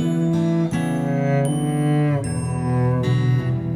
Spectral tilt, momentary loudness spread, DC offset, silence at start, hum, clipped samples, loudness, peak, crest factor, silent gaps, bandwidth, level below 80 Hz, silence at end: -7.5 dB/octave; 3 LU; under 0.1%; 0 s; none; under 0.1%; -21 LUFS; -8 dBFS; 10 dB; none; 14.5 kHz; -44 dBFS; 0 s